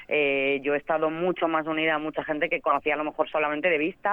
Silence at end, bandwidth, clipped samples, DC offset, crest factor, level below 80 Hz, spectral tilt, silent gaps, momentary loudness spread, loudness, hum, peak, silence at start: 0 s; 4 kHz; under 0.1%; under 0.1%; 16 dB; -62 dBFS; -7.5 dB/octave; none; 4 LU; -25 LUFS; none; -8 dBFS; 0 s